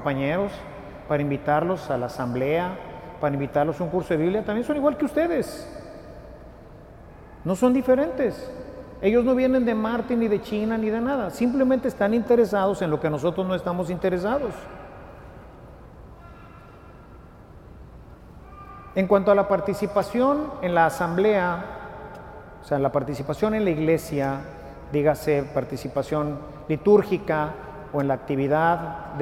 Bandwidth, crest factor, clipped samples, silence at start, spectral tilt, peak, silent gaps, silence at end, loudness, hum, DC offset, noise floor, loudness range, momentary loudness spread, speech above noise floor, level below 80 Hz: 16 kHz; 20 dB; under 0.1%; 0 s; -7.5 dB/octave; -6 dBFS; none; 0 s; -24 LUFS; none; under 0.1%; -46 dBFS; 5 LU; 20 LU; 23 dB; -48 dBFS